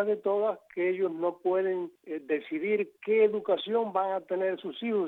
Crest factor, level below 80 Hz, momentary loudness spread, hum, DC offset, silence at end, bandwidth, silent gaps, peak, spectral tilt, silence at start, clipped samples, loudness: 16 dB; -86 dBFS; 7 LU; none; under 0.1%; 0 s; 4.1 kHz; none; -14 dBFS; -7.5 dB/octave; 0 s; under 0.1%; -29 LUFS